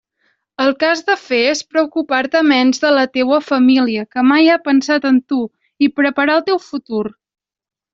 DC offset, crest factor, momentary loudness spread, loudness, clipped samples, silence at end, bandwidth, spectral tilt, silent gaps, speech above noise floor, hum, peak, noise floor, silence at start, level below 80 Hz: under 0.1%; 14 dB; 9 LU; -15 LUFS; under 0.1%; 0.8 s; 7.6 kHz; -3.5 dB/octave; none; 50 dB; none; -2 dBFS; -64 dBFS; 0.6 s; -62 dBFS